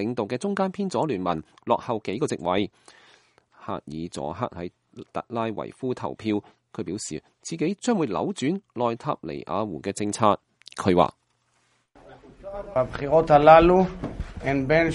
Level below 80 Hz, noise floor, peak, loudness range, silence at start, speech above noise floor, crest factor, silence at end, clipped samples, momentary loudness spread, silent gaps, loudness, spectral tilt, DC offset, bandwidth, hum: -46 dBFS; -68 dBFS; 0 dBFS; 11 LU; 0 s; 44 dB; 24 dB; 0 s; under 0.1%; 15 LU; none; -24 LUFS; -6 dB/octave; under 0.1%; 11.5 kHz; none